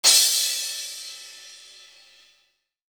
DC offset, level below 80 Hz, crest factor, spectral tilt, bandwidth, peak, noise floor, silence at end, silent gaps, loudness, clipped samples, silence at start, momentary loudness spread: under 0.1%; -82 dBFS; 24 dB; 4.5 dB/octave; over 20 kHz; -2 dBFS; -68 dBFS; 1.3 s; none; -20 LUFS; under 0.1%; 0.05 s; 27 LU